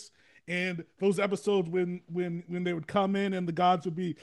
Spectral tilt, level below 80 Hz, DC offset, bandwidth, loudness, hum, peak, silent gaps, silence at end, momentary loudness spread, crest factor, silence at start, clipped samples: -6.5 dB/octave; -74 dBFS; under 0.1%; 12 kHz; -30 LUFS; none; -14 dBFS; none; 0 s; 8 LU; 16 dB; 0 s; under 0.1%